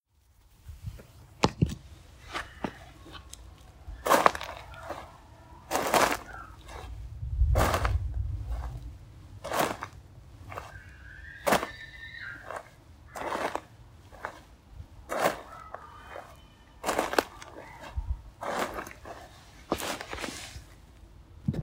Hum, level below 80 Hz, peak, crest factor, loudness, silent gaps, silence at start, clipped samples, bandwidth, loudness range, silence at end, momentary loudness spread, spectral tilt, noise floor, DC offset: none; -42 dBFS; -2 dBFS; 32 dB; -32 LUFS; none; 0.65 s; under 0.1%; 16.5 kHz; 8 LU; 0 s; 24 LU; -4.5 dB/octave; -63 dBFS; under 0.1%